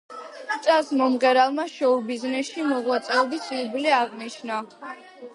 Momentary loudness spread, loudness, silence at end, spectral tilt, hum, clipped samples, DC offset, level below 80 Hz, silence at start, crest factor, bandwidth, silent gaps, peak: 18 LU; -23 LUFS; 0.05 s; -3 dB/octave; none; under 0.1%; under 0.1%; -80 dBFS; 0.1 s; 18 dB; 11.5 kHz; none; -6 dBFS